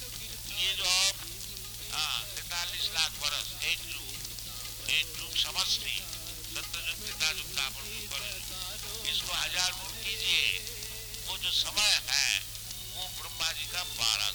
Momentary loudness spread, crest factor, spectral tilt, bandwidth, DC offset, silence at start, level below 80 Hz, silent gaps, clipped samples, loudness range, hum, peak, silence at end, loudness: 12 LU; 24 dB; 0.5 dB/octave; over 20 kHz; under 0.1%; 0 s; -52 dBFS; none; under 0.1%; 4 LU; none; -8 dBFS; 0 s; -30 LUFS